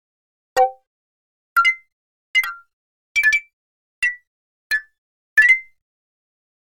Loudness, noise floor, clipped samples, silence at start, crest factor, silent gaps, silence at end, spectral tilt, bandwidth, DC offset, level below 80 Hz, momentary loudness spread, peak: -18 LUFS; under -90 dBFS; under 0.1%; 0.55 s; 20 dB; 0.87-1.56 s, 1.92-2.34 s, 2.73-3.15 s, 3.53-4.02 s, 4.27-4.70 s, 4.98-5.36 s; 1 s; 1.5 dB/octave; 18.5 kHz; 0.2%; -64 dBFS; 10 LU; -4 dBFS